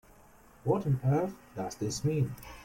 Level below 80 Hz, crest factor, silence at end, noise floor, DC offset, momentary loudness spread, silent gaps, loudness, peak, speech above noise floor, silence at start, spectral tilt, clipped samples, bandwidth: -58 dBFS; 16 dB; 0 s; -58 dBFS; under 0.1%; 10 LU; none; -32 LUFS; -16 dBFS; 27 dB; 0.65 s; -7 dB/octave; under 0.1%; 16.5 kHz